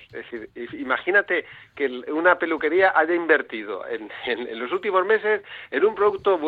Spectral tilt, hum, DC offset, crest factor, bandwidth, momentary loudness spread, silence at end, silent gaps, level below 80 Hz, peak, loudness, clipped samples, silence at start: -6.5 dB/octave; none; under 0.1%; 18 dB; 4.8 kHz; 14 LU; 0 s; none; -64 dBFS; -4 dBFS; -22 LUFS; under 0.1%; 0 s